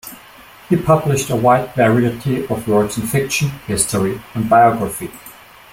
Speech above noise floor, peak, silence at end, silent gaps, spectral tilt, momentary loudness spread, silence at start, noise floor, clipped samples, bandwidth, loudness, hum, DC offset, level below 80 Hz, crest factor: 26 dB; 0 dBFS; 0.4 s; none; -5.5 dB/octave; 10 LU; 0.05 s; -41 dBFS; under 0.1%; 16.5 kHz; -16 LUFS; none; under 0.1%; -46 dBFS; 16 dB